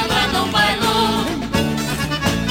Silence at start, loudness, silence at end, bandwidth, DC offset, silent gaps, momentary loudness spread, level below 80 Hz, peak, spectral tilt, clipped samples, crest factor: 0 s; -18 LUFS; 0 s; 16.5 kHz; under 0.1%; none; 5 LU; -36 dBFS; -6 dBFS; -4 dB/octave; under 0.1%; 14 dB